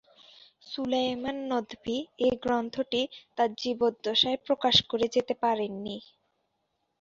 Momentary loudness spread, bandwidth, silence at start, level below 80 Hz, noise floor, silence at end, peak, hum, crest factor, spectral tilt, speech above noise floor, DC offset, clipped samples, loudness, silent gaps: 12 LU; 7.6 kHz; 0.65 s; -62 dBFS; -78 dBFS; 1 s; -6 dBFS; none; 24 dB; -4 dB/octave; 50 dB; under 0.1%; under 0.1%; -28 LUFS; none